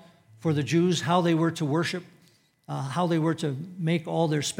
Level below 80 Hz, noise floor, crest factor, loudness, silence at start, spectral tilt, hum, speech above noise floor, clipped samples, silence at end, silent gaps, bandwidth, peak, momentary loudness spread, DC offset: -76 dBFS; -62 dBFS; 18 dB; -26 LUFS; 0.4 s; -6 dB/octave; none; 36 dB; under 0.1%; 0.05 s; none; 15.5 kHz; -10 dBFS; 9 LU; under 0.1%